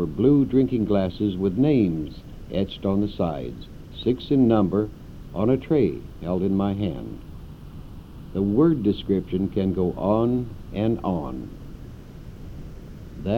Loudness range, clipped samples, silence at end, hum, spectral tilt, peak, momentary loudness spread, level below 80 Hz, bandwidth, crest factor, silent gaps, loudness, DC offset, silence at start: 3 LU; under 0.1%; 0 s; none; -9.5 dB/octave; -6 dBFS; 22 LU; -42 dBFS; 6.8 kHz; 18 dB; none; -23 LUFS; under 0.1%; 0 s